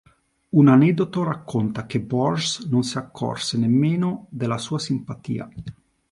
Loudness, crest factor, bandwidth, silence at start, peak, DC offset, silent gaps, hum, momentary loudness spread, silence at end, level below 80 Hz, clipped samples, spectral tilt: -22 LUFS; 18 dB; 11.5 kHz; 0.55 s; -4 dBFS; under 0.1%; none; none; 14 LU; 0.4 s; -56 dBFS; under 0.1%; -6 dB/octave